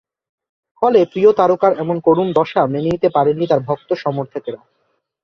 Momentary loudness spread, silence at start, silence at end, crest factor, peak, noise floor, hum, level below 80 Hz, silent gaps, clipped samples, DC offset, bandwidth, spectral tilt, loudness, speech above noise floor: 12 LU; 0.8 s; 0.65 s; 16 dB; -2 dBFS; -67 dBFS; none; -54 dBFS; none; under 0.1%; under 0.1%; 6.6 kHz; -8.5 dB/octave; -16 LUFS; 52 dB